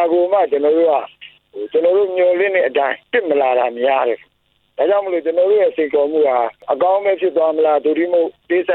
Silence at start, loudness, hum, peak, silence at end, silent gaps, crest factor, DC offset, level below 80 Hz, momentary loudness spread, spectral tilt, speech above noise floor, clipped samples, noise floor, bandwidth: 0 s; -16 LUFS; none; -2 dBFS; 0 s; none; 14 dB; under 0.1%; -68 dBFS; 6 LU; -7.5 dB/octave; 46 dB; under 0.1%; -62 dBFS; 4.2 kHz